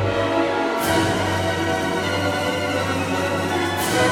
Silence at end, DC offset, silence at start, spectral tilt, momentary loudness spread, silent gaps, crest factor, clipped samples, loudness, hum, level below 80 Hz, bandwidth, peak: 0 s; under 0.1%; 0 s; -4.5 dB/octave; 3 LU; none; 16 dB; under 0.1%; -21 LUFS; none; -48 dBFS; 17.5 kHz; -6 dBFS